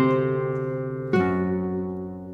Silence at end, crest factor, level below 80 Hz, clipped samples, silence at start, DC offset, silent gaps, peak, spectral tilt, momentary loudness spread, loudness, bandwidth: 0 s; 16 dB; -56 dBFS; under 0.1%; 0 s; under 0.1%; none; -10 dBFS; -9.5 dB/octave; 8 LU; -26 LUFS; 6.2 kHz